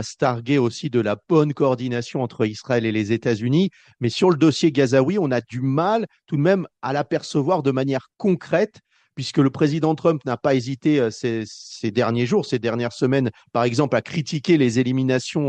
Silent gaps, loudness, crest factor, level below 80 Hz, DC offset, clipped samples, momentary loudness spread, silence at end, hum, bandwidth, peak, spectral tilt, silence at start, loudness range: none; -21 LUFS; 16 dB; -62 dBFS; under 0.1%; under 0.1%; 8 LU; 0 s; none; 9.4 kHz; -4 dBFS; -6.5 dB/octave; 0 s; 2 LU